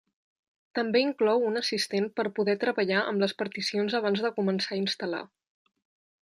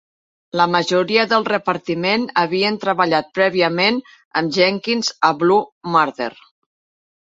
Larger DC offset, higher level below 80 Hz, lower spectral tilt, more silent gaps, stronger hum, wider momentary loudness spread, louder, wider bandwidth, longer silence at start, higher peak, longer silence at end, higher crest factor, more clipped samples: neither; second, -76 dBFS vs -64 dBFS; about the same, -4.5 dB/octave vs -4.5 dB/octave; second, none vs 4.25-4.31 s, 5.72-5.81 s; neither; about the same, 6 LU vs 6 LU; second, -28 LUFS vs -18 LUFS; first, 12.5 kHz vs 7.8 kHz; first, 0.75 s vs 0.55 s; second, -10 dBFS vs 0 dBFS; about the same, 0.95 s vs 0.9 s; about the same, 18 dB vs 18 dB; neither